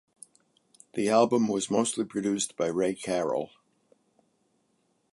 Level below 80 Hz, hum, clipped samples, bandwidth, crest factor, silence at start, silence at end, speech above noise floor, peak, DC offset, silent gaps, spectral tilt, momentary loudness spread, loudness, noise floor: -70 dBFS; none; under 0.1%; 11.5 kHz; 20 dB; 0.95 s; 1.65 s; 45 dB; -8 dBFS; under 0.1%; none; -4.5 dB/octave; 9 LU; -28 LUFS; -72 dBFS